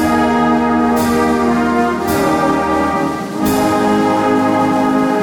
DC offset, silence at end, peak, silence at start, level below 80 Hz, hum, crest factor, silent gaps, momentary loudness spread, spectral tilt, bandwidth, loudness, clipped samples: under 0.1%; 0 s; -4 dBFS; 0 s; -38 dBFS; none; 10 dB; none; 2 LU; -5.5 dB/octave; 17 kHz; -14 LUFS; under 0.1%